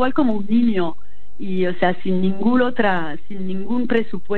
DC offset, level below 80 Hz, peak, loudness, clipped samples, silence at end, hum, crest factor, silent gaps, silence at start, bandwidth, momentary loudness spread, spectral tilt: 10%; -52 dBFS; -2 dBFS; -21 LUFS; under 0.1%; 0 s; none; 16 dB; none; 0 s; 4.4 kHz; 10 LU; -9 dB/octave